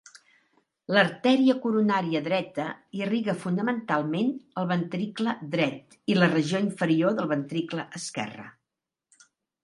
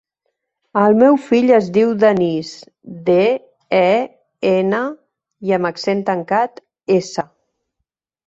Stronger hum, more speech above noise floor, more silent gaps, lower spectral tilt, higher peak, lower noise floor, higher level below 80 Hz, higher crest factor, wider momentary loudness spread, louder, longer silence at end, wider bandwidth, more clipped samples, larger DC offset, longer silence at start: neither; about the same, 61 dB vs 62 dB; neither; about the same, -6 dB/octave vs -6.5 dB/octave; about the same, -4 dBFS vs -2 dBFS; first, -87 dBFS vs -78 dBFS; second, -74 dBFS vs -62 dBFS; first, 22 dB vs 16 dB; second, 11 LU vs 14 LU; second, -26 LUFS vs -16 LUFS; first, 1.15 s vs 1 s; first, 11.5 kHz vs 8 kHz; neither; neither; first, 0.9 s vs 0.75 s